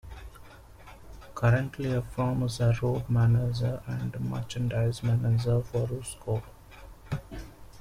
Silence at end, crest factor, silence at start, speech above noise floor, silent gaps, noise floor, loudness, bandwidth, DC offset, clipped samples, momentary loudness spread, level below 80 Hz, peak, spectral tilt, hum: 0 s; 18 dB; 0.05 s; 22 dB; none; -49 dBFS; -29 LUFS; 12 kHz; under 0.1%; under 0.1%; 20 LU; -48 dBFS; -12 dBFS; -7 dB/octave; none